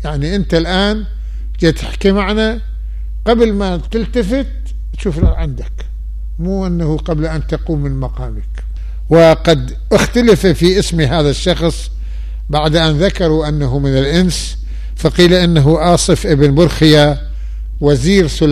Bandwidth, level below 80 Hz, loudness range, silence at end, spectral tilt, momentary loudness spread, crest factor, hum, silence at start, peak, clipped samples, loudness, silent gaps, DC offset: 14 kHz; -20 dBFS; 8 LU; 0 s; -6 dB/octave; 16 LU; 12 dB; none; 0 s; 0 dBFS; under 0.1%; -13 LUFS; none; 0.1%